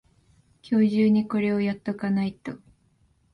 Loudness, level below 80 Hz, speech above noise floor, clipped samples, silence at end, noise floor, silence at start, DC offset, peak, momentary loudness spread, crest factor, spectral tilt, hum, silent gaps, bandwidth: -24 LUFS; -62 dBFS; 41 dB; under 0.1%; 0.75 s; -64 dBFS; 0.65 s; under 0.1%; -12 dBFS; 18 LU; 14 dB; -8.5 dB/octave; none; none; 5.8 kHz